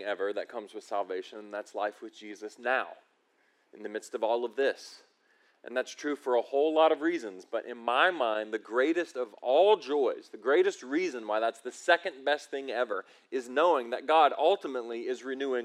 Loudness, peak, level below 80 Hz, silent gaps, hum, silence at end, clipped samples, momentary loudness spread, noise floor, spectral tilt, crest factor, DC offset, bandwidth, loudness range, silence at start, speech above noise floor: -30 LUFS; -10 dBFS; under -90 dBFS; none; none; 0 s; under 0.1%; 15 LU; -70 dBFS; -3 dB/octave; 20 dB; under 0.1%; 12.5 kHz; 8 LU; 0 s; 41 dB